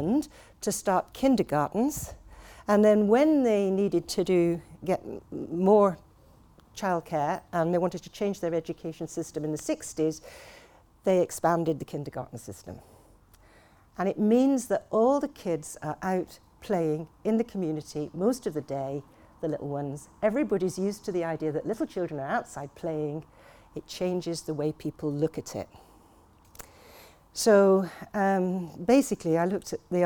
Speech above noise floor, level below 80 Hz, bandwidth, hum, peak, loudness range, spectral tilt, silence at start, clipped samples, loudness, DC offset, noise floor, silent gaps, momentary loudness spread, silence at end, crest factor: 30 dB; -58 dBFS; 19.5 kHz; none; -8 dBFS; 8 LU; -6 dB/octave; 0 s; under 0.1%; -28 LUFS; under 0.1%; -58 dBFS; none; 17 LU; 0 s; 20 dB